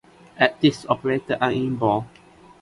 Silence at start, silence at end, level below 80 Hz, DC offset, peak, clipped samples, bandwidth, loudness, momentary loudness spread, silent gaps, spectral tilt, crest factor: 0.35 s; 0.55 s; -56 dBFS; under 0.1%; -4 dBFS; under 0.1%; 11.5 kHz; -22 LUFS; 6 LU; none; -6 dB/octave; 20 dB